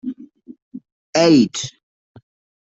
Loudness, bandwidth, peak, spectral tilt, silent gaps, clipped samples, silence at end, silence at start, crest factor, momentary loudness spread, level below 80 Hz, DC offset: -16 LUFS; 8 kHz; -2 dBFS; -5 dB/octave; 0.62-0.71 s, 0.92-1.13 s; under 0.1%; 1.05 s; 0.05 s; 18 dB; 26 LU; -60 dBFS; under 0.1%